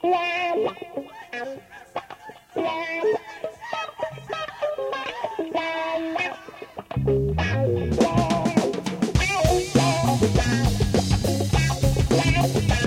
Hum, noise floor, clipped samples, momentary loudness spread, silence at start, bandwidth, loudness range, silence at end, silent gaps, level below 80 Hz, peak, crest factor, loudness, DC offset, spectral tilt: none; -43 dBFS; under 0.1%; 15 LU; 0.05 s; 16.5 kHz; 8 LU; 0 s; none; -34 dBFS; -6 dBFS; 18 dB; -23 LUFS; under 0.1%; -5.5 dB/octave